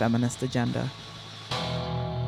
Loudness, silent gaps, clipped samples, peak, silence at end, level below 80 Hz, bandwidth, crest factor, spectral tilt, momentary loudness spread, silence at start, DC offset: -29 LUFS; none; under 0.1%; -12 dBFS; 0 s; -50 dBFS; 13 kHz; 18 dB; -5.5 dB/octave; 13 LU; 0 s; under 0.1%